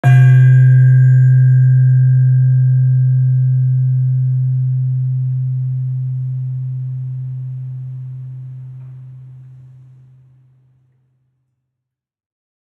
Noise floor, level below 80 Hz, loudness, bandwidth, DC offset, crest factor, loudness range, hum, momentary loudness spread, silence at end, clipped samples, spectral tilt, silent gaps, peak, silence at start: -80 dBFS; -64 dBFS; -13 LUFS; 2.9 kHz; under 0.1%; 12 dB; 20 LU; none; 20 LU; 3.25 s; under 0.1%; -10.5 dB/octave; none; -2 dBFS; 0.05 s